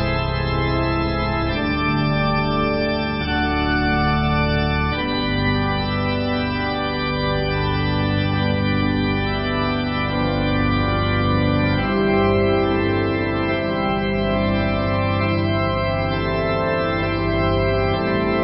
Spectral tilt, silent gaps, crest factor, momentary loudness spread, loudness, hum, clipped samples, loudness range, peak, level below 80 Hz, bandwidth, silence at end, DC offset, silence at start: -11.5 dB/octave; none; 12 dB; 3 LU; -20 LUFS; none; under 0.1%; 2 LU; -6 dBFS; -30 dBFS; 5.6 kHz; 0 s; under 0.1%; 0 s